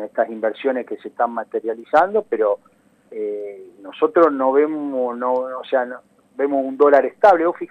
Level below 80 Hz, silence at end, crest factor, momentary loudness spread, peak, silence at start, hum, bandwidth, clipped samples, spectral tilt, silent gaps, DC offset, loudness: -70 dBFS; 0.05 s; 16 dB; 16 LU; -2 dBFS; 0 s; 50 Hz at -65 dBFS; 6.8 kHz; under 0.1%; -6.5 dB/octave; none; under 0.1%; -19 LUFS